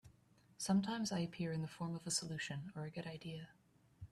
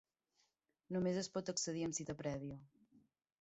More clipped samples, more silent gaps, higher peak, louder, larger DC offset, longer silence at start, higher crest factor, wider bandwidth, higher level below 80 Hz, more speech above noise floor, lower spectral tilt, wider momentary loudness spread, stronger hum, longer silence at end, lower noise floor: neither; neither; about the same, -26 dBFS vs -26 dBFS; about the same, -42 LUFS vs -42 LUFS; neither; second, 0.05 s vs 0.9 s; about the same, 18 dB vs 18 dB; first, 13 kHz vs 8 kHz; about the same, -74 dBFS vs -72 dBFS; second, 28 dB vs 40 dB; about the same, -4.5 dB/octave vs -5.5 dB/octave; first, 13 LU vs 9 LU; neither; second, 0.05 s vs 0.45 s; second, -70 dBFS vs -82 dBFS